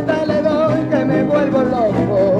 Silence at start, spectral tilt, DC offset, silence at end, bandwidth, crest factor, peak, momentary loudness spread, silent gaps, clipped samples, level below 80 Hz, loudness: 0 s; -8 dB/octave; under 0.1%; 0 s; 9.2 kHz; 10 dB; -4 dBFS; 1 LU; none; under 0.1%; -42 dBFS; -16 LUFS